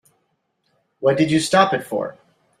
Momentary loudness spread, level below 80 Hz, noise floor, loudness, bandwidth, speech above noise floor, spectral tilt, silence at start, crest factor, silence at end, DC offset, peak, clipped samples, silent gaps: 11 LU; -60 dBFS; -70 dBFS; -19 LUFS; 14.5 kHz; 52 dB; -5 dB/octave; 1 s; 20 dB; 0.5 s; under 0.1%; -2 dBFS; under 0.1%; none